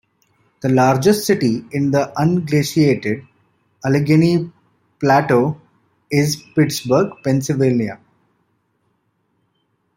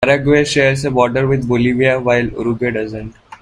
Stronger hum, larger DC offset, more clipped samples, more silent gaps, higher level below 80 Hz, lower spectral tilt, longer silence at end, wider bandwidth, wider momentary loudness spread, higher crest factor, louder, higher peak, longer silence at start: neither; neither; neither; neither; second, -56 dBFS vs -40 dBFS; about the same, -6 dB/octave vs -6 dB/octave; first, 2 s vs 0.05 s; first, 16.5 kHz vs 11 kHz; about the same, 9 LU vs 10 LU; about the same, 16 dB vs 14 dB; about the same, -17 LUFS vs -15 LUFS; about the same, -2 dBFS vs 0 dBFS; first, 0.65 s vs 0 s